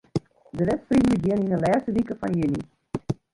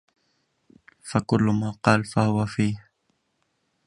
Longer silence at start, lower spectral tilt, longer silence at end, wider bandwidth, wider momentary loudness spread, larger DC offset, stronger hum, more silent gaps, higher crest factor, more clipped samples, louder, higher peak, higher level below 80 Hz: second, 0.15 s vs 1.05 s; first, -8 dB/octave vs -6.5 dB/octave; second, 0.2 s vs 1.05 s; about the same, 11.5 kHz vs 11.5 kHz; first, 12 LU vs 7 LU; neither; neither; neither; second, 14 dB vs 24 dB; neither; about the same, -24 LUFS vs -24 LUFS; second, -10 dBFS vs -2 dBFS; first, -48 dBFS vs -54 dBFS